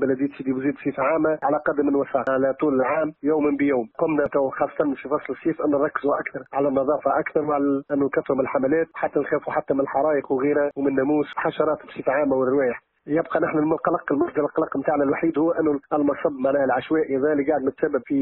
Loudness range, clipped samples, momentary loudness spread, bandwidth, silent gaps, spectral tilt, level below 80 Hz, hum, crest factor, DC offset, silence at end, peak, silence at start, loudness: 1 LU; under 0.1%; 4 LU; 4.1 kHz; none; -10.5 dB/octave; -60 dBFS; none; 16 dB; under 0.1%; 0 s; -6 dBFS; 0 s; -23 LUFS